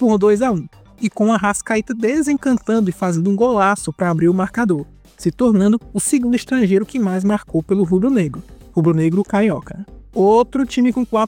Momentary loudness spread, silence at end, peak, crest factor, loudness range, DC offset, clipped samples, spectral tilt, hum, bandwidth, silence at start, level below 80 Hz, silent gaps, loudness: 10 LU; 0 s; -4 dBFS; 14 dB; 1 LU; under 0.1%; under 0.1%; -6.5 dB/octave; none; 16.5 kHz; 0 s; -46 dBFS; none; -17 LUFS